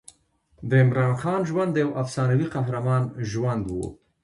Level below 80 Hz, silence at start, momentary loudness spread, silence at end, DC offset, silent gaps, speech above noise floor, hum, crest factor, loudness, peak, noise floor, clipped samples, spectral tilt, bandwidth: -52 dBFS; 0.6 s; 10 LU; 0.3 s; under 0.1%; none; 39 dB; none; 16 dB; -24 LUFS; -8 dBFS; -62 dBFS; under 0.1%; -7.5 dB/octave; 11 kHz